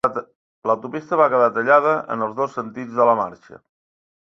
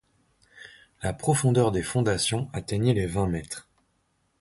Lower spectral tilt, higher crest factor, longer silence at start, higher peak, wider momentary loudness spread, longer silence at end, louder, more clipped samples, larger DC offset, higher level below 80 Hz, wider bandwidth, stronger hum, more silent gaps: first, -7 dB/octave vs -5.5 dB/octave; about the same, 18 dB vs 18 dB; second, 0.05 s vs 0.55 s; first, -2 dBFS vs -10 dBFS; about the same, 13 LU vs 12 LU; about the same, 0.75 s vs 0.8 s; first, -19 LUFS vs -26 LUFS; neither; neither; second, -64 dBFS vs -46 dBFS; second, 7.4 kHz vs 11.5 kHz; neither; first, 0.36-0.62 s vs none